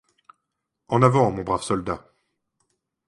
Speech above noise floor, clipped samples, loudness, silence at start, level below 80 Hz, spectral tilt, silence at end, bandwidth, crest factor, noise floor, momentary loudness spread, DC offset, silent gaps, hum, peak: 60 dB; under 0.1%; -22 LUFS; 0.9 s; -52 dBFS; -7 dB/octave; 1.1 s; 11.5 kHz; 22 dB; -80 dBFS; 12 LU; under 0.1%; none; none; -2 dBFS